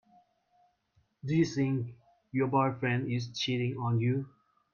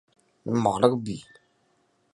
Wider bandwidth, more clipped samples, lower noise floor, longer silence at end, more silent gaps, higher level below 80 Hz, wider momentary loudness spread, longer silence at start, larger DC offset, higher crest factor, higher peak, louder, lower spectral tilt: second, 7.2 kHz vs 11.5 kHz; neither; first, -72 dBFS vs -68 dBFS; second, 0.45 s vs 0.95 s; neither; second, -70 dBFS vs -62 dBFS; second, 9 LU vs 17 LU; first, 1.25 s vs 0.45 s; neither; second, 18 dB vs 26 dB; second, -14 dBFS vs -2 dBFS; second, -31 LUFS vs -25 LUFS; about the same, -6.5 dB/octave vs -6.5 dB/octave